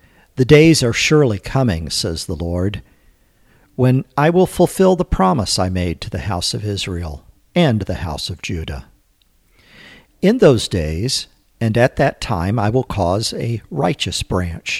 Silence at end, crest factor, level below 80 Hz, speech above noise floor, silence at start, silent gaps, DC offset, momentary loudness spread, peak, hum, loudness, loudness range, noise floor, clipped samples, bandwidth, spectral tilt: 0 s; 18 dB; -36 dBFS; 41 dB; 0.35 s; none; under 0.1%; 12 LU; 0 dBFS; none; -17 LUFS; 5 LU; -57 dBFS; under 0.1%; 15 kHz; -5.5 dB/octave